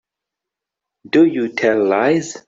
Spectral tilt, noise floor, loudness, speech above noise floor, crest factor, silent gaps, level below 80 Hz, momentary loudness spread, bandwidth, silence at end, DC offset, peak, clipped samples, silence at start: -5.5 dB/octave; -84 dBFS; -16 LUFS; 69 dB; 16 dB; none; -62 dBFS; 4 LU; 7.8 kHz; 0.1 s; under 0.1%; -2 dBFS; under 0.1%; 1.15 s